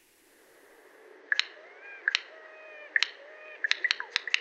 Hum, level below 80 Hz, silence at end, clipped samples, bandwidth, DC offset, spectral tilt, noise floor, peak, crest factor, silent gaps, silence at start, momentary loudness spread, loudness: none; under -90 dBFS; 0 s; under 0.1%; 15.5 kHz; under 0.1%; 4 dB/octave; -61 dBFS; -4 dBFS; 32 dB; none; 1.3 s; 19 LU; -29 LUFS